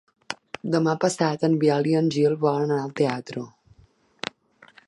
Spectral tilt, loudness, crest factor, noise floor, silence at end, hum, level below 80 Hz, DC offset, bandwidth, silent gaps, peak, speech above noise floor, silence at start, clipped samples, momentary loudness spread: -6 dB/octave; -23 LUFS; 18 dB; -58 dBFS; 1.4 s; none; -68 dBFS; under 0.1%; 11.5 kHz; none; -6 dBFS; 36 dB; 0.3 s; under 0.1%; 15 LU